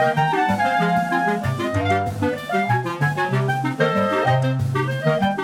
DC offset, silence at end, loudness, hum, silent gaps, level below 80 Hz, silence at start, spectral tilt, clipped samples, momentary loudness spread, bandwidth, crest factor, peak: under 0.1%; 0 s; -20 LUFS; none; none; -54 dBFS; 0 s; -6.5 dB/octave; under 0.1%; 4 LU; 16 kHz; 14 dB; -6 dBFS